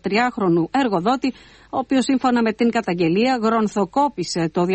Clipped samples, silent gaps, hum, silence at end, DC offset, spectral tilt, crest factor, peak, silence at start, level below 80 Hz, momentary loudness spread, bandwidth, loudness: under 0.1%; none; none; 0 s; under 0.1%; -5.5 dB/octave; 14 dB; -6 dBFS; 0.05 s; -56 dBFS; 5 LU; 8.8 kHz; -20 LUFS